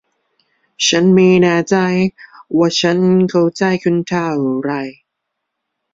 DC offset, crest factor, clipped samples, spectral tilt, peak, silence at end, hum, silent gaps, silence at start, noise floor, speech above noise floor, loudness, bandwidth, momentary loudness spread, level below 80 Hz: under 0.1%; 14 dB; under 0.1%; -5 dB/octave; -2 dBFS; 1 s; none; none; 0.8 s; -76 dBFS; 62 dB; -14 LUFS; 7.8 kHz; 10 LU; -56 dBFS